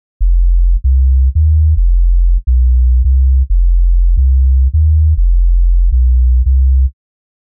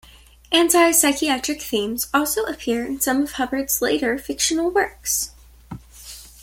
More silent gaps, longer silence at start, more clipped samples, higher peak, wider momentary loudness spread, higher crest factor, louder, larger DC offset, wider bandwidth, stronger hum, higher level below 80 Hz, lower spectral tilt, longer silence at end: neither; second, 0.2 s vs 0.5 s; neither; about the same, -4 dBFS vs -2 dBFS; second, 3 LU vs 23 LU; second, 4 dB vs 20 dB; first, -13 LUFS vs -20 LUFS; neither; second, 0.2 kHz vs 17 kHz; neither; first, -10 dBFS vs -48 dBFS; first, -15 dB/octave vs -1.5 dB/octave; first, 0.65 s vs 0.15 s